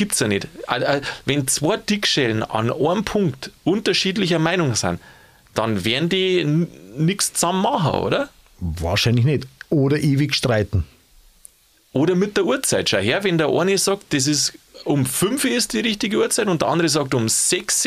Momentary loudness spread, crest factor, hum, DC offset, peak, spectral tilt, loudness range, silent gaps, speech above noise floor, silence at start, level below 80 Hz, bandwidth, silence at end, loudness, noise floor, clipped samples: 7 LU; 18 dB; none; under 0.1%; -2 dBFS; -4 dB/octave; 2 LU; none; 32 dB; 0 s; -44 dBFS; 15.5 kHz; 0 s; -20 LUFS; -52 dBFS; under 0.1%